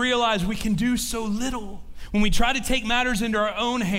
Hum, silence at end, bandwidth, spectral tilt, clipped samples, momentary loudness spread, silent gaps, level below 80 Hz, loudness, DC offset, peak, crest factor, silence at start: none; 0 s; 16 kHz; -4 dB/octave; under 0.1%; 7 LU; none; -34 dBFS; -24 LUFS; under 0.1%; -8 dBFS; 16 dB; 0 s